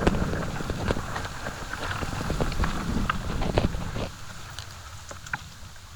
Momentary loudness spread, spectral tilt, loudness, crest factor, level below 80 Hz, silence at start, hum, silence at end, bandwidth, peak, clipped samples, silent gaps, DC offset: 13 LU; -5.5 dB/octave; -31 LUFS; 22 dB; -34 dBFS; 0 s; none; 0 s; over 20 kHz; -6 dBFS; under 0.1%; none; under 0.1%